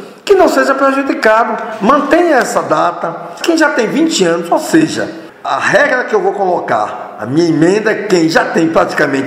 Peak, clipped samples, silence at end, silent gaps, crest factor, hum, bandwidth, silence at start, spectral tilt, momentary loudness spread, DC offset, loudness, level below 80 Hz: 0 dBFS; 0.2%; 0 s; none; 12 dB; none; 16 kHz; 0 s; -4.5 dB/octave; 8 LU; under 0.1%; -12 LUFS; -50 dBFS